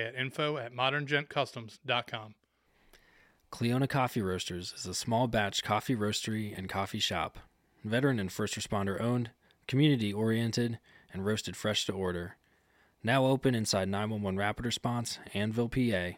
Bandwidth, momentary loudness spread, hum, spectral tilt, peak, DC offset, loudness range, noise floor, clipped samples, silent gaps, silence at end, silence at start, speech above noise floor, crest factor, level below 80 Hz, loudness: 16.5 kHz; 9 LU; none; -5 dB/octave; -12 dBFS; under 0.1%; 3 LU; -69 dBFS; under 0.1%; none; 0 s; 0 s; 37 dB; 20 dB; -60 dBFS; -32 LUFS